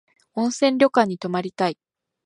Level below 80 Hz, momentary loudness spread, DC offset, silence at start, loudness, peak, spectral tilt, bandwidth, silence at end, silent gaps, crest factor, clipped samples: -70 dBFS; 11 LU; under 0.1%; 0.35 s; -21 LUFS; -2 dBFS; -5 dB/octave; 11.5 kHz; 0.55 s; none; 20 dB; under 0.1%